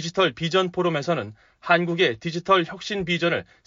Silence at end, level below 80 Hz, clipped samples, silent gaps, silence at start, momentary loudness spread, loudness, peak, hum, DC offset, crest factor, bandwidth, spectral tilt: 0.25 s; -58 dBFS; under 0.1%; none; 0 s; 8 LU; -23 LUFS; -6 dBFS; none; under 0.1%; 18 dB; 7.6 kHz; -3 dB/octave